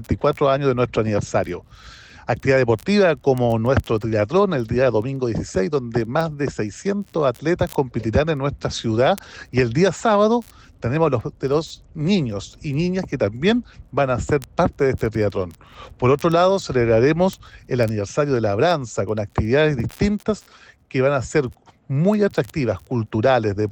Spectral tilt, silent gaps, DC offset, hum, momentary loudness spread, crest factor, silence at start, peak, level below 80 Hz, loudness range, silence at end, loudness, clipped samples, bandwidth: -6.5 dB/octave; none; under 0.1%; none; 8 LU; 14 dB; 0 s; -6 dBFS; -42 dBFS; 3 LU; 0 s; -20 LUFS; under 0.1%; over 20 kHz